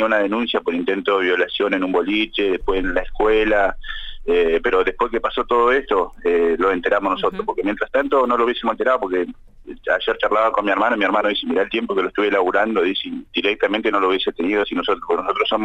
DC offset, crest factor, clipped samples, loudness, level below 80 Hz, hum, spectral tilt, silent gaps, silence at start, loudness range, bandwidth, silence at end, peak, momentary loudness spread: under 0.1%; 14 dB; under 0.1%; -19 LUFS; -38 dBFS; none; -5.5 dB/octave; none; 0 s; 1 LU; 8 kHz; 0 s; -6 dBFS; 5 LU